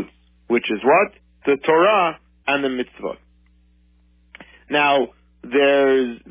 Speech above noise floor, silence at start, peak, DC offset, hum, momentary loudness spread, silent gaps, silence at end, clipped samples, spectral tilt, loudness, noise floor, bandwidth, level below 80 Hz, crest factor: 38 dB; 0 s; -4 dBFS; under 0.1%; 60 Hz at -55 dBFS; 14 LU; none; 0.15 s; under 0.1%; -8.5 dB/octave; -19 LUFS; -56 dBFS; 3.7 kHz; -56 dBFS; 16 dB